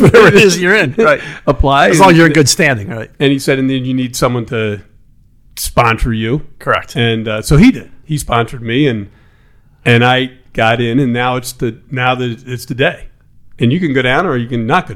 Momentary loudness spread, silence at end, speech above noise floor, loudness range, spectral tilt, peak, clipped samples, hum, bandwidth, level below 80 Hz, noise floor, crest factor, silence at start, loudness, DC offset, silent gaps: 13 LU; 0 s; 34 dB; 6 LU; -5 dB/octave; 0 dBFS; 1%; none; 17.5 kHz; -30 dBFS; -46 dBFS; 12 dB; 0 s; -12 LUFS; under 0.1%; none